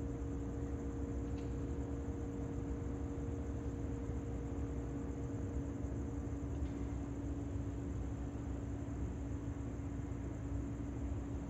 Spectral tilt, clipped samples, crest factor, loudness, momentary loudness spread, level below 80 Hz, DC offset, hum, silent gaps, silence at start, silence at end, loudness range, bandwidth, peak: -8.5 dB/octave; under 0.1%; 12 dB; -43 LUFS; 1 LU; -46 dBFS; under 0.1%; none; none; 0 s; 0 s; 1 LU; 8.2 kHz; -28 dBFS